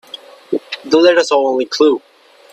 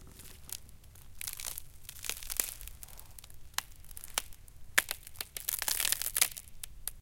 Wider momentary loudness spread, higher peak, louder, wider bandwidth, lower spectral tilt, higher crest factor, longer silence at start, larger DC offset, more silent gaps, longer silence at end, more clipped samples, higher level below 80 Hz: second, 14 LU vs 20 LU; first, 0 dBFS vs -4 dBFS; first, -14 LUFS vs -34 LUFS; second, 10.5 kHz vs 17 kHz; first, -3 dB/octave vs 1 dB/octave; second, 14 dB vs 34 dB; first, 0.15 s vs 0 s; neither; neither; first, 0.55 s vs 0 s; neither; second, -66 dBFS vs -54 dBFS